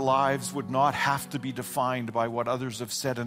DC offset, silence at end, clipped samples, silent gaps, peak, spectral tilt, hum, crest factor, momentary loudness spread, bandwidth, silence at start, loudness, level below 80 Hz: under 0.1%; 0 s; under 0.1%; none; -12 dBFS; -4.5 dB/octave; none; 16 dB; 8 LU; 16 kHz; 0 s; -28 LUFS; -64 dBFS